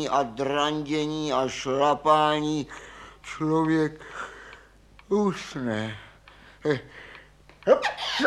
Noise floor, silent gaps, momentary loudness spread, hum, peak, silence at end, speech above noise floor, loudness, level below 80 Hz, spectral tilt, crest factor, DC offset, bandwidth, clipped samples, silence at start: -53 dBFS; none; 21 LU; none; -6 dBFS; 0 s; 28 dB; -26 LUFS; -56 dBFS; -5 dB/octave; 20 dB; under 0.1%; 12 kHz; under 0.1%; 0 s